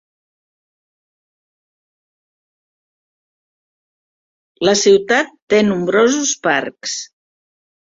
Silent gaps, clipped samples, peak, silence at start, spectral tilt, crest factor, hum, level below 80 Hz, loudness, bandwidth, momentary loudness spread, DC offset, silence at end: 5.42-5.47 s; under 0.1%; -2 dBFS; 4.6 s; -3 dB/octave; 18 dB; none; -62 dBFS; -15 LUFS; 7.8 kHz; 12 LU; under 0.1%; 0.9 s